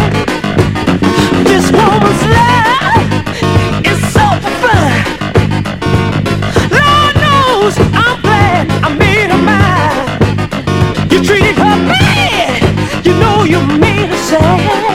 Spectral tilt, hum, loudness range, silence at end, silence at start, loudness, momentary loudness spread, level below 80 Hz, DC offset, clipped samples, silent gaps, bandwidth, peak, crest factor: -5.5 dB/octave; none; 2 LU; 0 s; 0 s; -9 LUFS; 5 LU; -26 dBFS; under 0.1%; 2%; none; 16 kHz; 0 dBFS; 10 dB